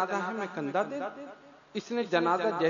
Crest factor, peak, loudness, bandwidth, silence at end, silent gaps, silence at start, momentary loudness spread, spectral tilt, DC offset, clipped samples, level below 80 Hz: 20 dB; -12 dBFS; -31 LUFS; 7.4 kHz; 0 s; none; 0 s; 13 LU; -5.5 dB/octave; under 0.1%; under 0.1%; -80 dBFS